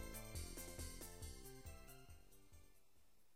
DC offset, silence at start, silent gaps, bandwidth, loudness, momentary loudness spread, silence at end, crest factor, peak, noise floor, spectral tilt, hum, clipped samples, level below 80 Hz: under 0.1%; 0 s; none; 16 kHz; -54 LUFS; 16 LU; 0 s; 18 dB; -38 dBFS; -78 dBFS; -3.5 dB/octave; none; under 0.1%; -60 dBFS